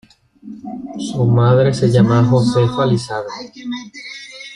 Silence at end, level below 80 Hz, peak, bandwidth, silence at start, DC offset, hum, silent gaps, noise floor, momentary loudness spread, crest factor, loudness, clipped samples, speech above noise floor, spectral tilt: 0 s; -48 dBFS; -2 dBFS; 10.5 kHz; 0.45 s; under 0.1%; none; none; -38 dBFS; 18 LU; 14 dB; -15 LUFS; under 0.1%; 23 dB; -7.5 dB/octave